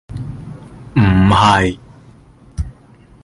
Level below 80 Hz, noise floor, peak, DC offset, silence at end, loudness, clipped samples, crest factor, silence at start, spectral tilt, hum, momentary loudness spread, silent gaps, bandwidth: -30 dBFS; -45 dBFS; 0 dBFS; under 0.1%; 0.55 s; -13 LUFS; under 0.1%; 16 dB; 0.1 s; -6.5 dB/octave; none; 23 LU; none; 11 kHz